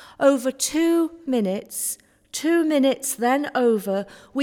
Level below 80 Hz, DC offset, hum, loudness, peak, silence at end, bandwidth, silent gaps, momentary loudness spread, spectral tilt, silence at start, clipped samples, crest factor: -66 dBFS; under 0.1%; none; -22 LUFS; -4 dBFS; 0 s; 18.5 kHz; none; 8 LU; -3.5 dB/octave; 0 s; under 0.1%; 18 dB